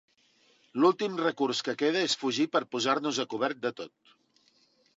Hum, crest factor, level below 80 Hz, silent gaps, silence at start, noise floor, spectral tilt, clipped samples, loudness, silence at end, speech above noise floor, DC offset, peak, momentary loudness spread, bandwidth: none; 18 dB; -84 dBFS; none; 0.75 s; -67 dBFS; -3.5 dB/octave; under 0.1%; -29 LUFS; 1.1 s; 38 dB; under 0.1%; -12 dBFS; 10 LU; 8 kHz